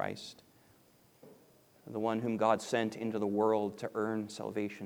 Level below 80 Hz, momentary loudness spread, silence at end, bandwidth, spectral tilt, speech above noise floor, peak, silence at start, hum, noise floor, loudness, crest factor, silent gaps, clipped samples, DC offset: -80 dBFS; 9 LU; 0 s; over 20 kHz; -5.5 dB/octave; 31 dB; -14 dBFS; 0 s; none; -65 dBFS; -34 LUFS; 22 dB; none; under 0.1%; under 0.1%